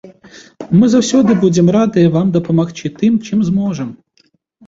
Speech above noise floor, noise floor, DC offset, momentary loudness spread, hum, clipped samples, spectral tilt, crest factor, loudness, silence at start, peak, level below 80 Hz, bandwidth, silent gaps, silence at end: 45 dB; -57 dBFS; under 0.1%; 10 LU; none; under 0.1%; -7 dB/octave; 12 dB; -13 LUFS; 0.05 s; -2 dBFS; -50 dBFS; 7.8 kHz; none; 0.7 s